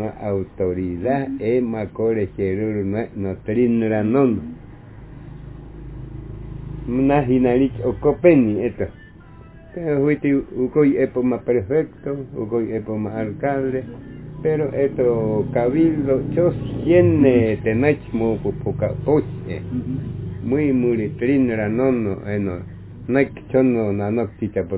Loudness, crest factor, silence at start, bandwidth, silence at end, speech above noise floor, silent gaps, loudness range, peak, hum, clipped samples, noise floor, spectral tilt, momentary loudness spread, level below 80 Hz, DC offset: -20 LUFS; 18 dB; 0 s; 4 kHz; 0 s; 23 dB; none; 5 LU; -2 dBFS; none; under 0.1%; -42 dBFS; -12.5 dB/octave; 17 LU; -42 dBFS; under 0.1%